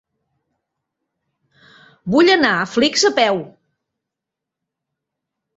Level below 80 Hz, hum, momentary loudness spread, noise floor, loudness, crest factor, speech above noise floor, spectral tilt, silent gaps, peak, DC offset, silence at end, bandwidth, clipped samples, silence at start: -60 dBFS; none; 9 LU; -84 dBFS; -15 LUFS; 20 dB; 68 dB; -3.5 dB/octave; none; -2 dBFS; under 0.1%; 2.1 s; 8.2 kHz; under 0.1%; 2.05 s